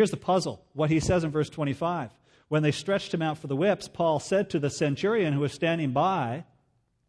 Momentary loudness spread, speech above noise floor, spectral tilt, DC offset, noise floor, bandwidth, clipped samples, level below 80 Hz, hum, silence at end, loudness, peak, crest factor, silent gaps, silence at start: 5 LU; 44 dB; -6 dB/octave; under 0.1%; -70 dBFS; 11 kHz; under 0.1%; -54 dBFS; none; 0.65 s; -27 LUFS; -10 dBFS; 16 dB; none; 0 s